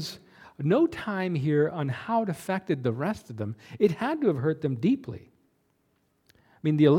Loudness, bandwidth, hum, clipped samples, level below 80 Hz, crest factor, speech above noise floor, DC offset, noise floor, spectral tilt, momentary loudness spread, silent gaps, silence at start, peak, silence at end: -28 LUFS; 16 kHz; none; under 0.1%; -64 dBFS; 20 dB; 45 dB; under 0.1%; -71 dBFS; -7.5 dB/octave; 12 LU; none; 0 s; -8 dBFS; 0 s